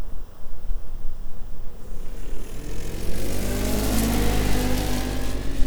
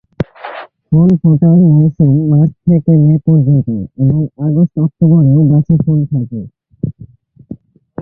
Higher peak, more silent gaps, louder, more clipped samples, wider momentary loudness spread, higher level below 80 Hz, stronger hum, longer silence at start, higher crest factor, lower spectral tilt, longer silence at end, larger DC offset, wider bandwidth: about the same, -4 dBFS vs -2 dBFS; neither; second, -27 LUFS vs -11 LUFS; neither; first, 18 LU vs 15 LU; first, -28 dBFS vs -42 dBFS; neither; second, 0 s vs 0.2 s; about the same, 14 dB vs 10 dB; second, -5 dB/octave vs -13 dB/octave; about the same, 0 s vs 0 s; neither; first, over 20 kHz vs 3.2 kHz